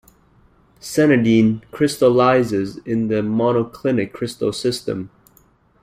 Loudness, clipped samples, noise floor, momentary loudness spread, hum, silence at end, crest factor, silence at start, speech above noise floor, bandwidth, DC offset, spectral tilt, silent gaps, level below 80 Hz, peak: -18 LUFS; under 0.1%; -55 dBFS; 11 LU; none; 0.75 s; 16 dB; 0.85 s; 38 dB; 15.5 kHz; under 0.1%; -6 dB/octave; none; -54 dBFS; -2 dBFS